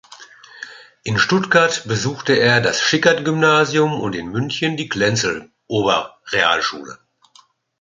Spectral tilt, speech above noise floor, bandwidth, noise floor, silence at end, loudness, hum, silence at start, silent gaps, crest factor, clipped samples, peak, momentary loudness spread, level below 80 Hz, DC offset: -4 dB/octave; 35 dB; 9.4 kHz; -53 dBFS; 0.85 s; -17 LUFS; none; 0.1 s; none; 18 dB; under 0.1%; 0 dBFS; 16 LU; -54 dBFS; under 0.1%